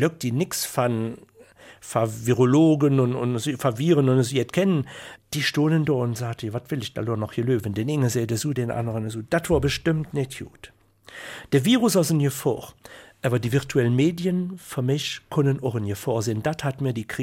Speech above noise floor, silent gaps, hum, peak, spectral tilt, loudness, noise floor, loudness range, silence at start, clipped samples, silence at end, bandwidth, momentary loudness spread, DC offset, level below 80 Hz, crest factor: 26 dB; none; none; -8 dBFS; -6 dB/octave; -23 LUFS; -49 dBFS; 4 LU; 0 s; under 0.1%; 0 s; 16.5 kHz; 12 LU; under 0.1%; -50 dBFS; 16 dB